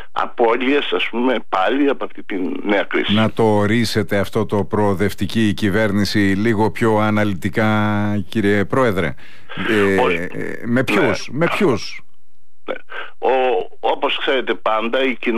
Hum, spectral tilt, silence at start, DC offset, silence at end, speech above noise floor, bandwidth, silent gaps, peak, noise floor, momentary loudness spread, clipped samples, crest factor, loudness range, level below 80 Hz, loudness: none; -6 dB/octave; 0 s; 5%; 0 s; 47 dB; 15.5 kHz; none; -6 dBFS; -64 dBFS; 9 LU; under 0.1%; 14 dB; 3 LU; -50 dBFS; -18 LUFS